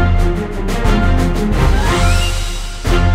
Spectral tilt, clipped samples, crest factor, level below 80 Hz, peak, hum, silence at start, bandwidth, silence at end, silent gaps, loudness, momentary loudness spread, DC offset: -5.5 dB/octave; under 0.1%; 12 dB; -16 dBFS; -2 dBFS; none; 0 s; 15 kHz; 0 s; none; -16 LUFS; 7 LU; under 0.1%